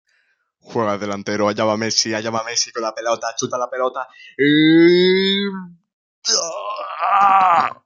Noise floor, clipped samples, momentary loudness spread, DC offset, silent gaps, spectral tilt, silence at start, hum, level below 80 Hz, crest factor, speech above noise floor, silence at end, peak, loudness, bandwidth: -65 dBFS; under 0.1%; 13 LU; under 0.1%; 5.93-6.22 s; -3.5 dB/octave; 0.7 s; none; -66 dBFS; 18 dB; 47 dB; 0.1 s; 0 dBFS; -17 LUFS; 7.6 kHz